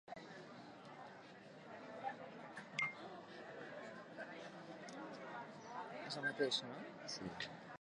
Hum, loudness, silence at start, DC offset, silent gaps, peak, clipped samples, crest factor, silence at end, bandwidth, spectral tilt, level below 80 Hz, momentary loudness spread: none; -48 LUFS; 0.05 s; under 0.1%; none; -24 dBFS; under 0.1%; 26 dB; 0.05 s; 11 kHz; -3.5 dB/octave; -84 dBFS; 15 LU